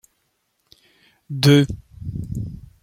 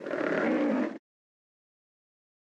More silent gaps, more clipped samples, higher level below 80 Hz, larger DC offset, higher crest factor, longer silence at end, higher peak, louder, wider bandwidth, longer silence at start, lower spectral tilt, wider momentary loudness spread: neither; neither; first, -44 dBFS vs -84 dBFS; neither; about the same, 20 dB vs 16 dB; second, 0.2 s vs 1.45 s; first, -2 dBFS vs -16 dBFS; first, -19 LUFS vs -29 LUFS; first, 16 kHz vs 8.2 kHz; first, 1.3 s vs 0 s; about the same, -6 dB/octave vs -7 dB/octave; first, 19 LU vs 10 LU